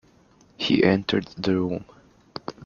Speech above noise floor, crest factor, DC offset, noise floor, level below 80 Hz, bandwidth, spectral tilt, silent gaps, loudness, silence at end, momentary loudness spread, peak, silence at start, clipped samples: 34 dB; 22 dB; under 0.1%; -57 dBFS; -58 dBFS; 7.2 kHz; -6.5 dB/octave; none; -23 LUFS; 0 s; 18 LU; -4 dBFS; 0.6 s; under 0.1%